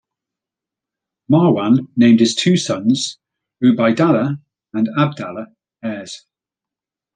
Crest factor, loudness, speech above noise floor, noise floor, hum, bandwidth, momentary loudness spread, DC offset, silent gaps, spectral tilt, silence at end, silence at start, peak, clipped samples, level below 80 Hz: 16 dB; -16 LUFS; 72 dB; -87 dBFS; none; 9.6 kHz; 17 LU; under 0.1%; none; -6 dB/octave; 1 s; 1.3 s; -2 dBFS; under 0.1%; -60 dBFS